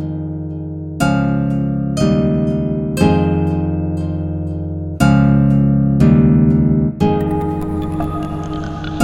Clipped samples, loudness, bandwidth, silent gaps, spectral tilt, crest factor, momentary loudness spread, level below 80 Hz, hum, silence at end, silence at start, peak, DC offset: under 0.1%; -16 LUFS; 13.5 kHz; none; -8 dB/octave; 14 dB; 12 LU; -30 dBFS; none; 0 s; 0 s; 0 dBFS; under 0.1%